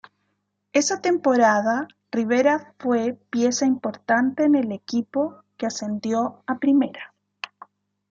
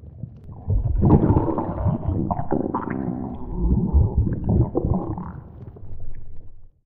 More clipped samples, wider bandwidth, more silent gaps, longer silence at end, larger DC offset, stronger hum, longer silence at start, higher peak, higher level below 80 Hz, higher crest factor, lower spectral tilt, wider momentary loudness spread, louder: neither; first, 7.8 kHz vs 2.8 kHz; neither; first, 1.05 s vs 0.2 s; neither; first, 50 Hz at -50 dBFS vs none; first, 0.75 s vs 0 s; about the same, -6 dBFS vs -4 dBFS; second, -72 dBFS vs -28 dBFS; about the same, 18 dB vs 18 dB; second, -4 dB/octave vs -14.5 dB/octave; second, 10 LU vs 22 LU; about the same, -22 LUFS vs -23 LUFS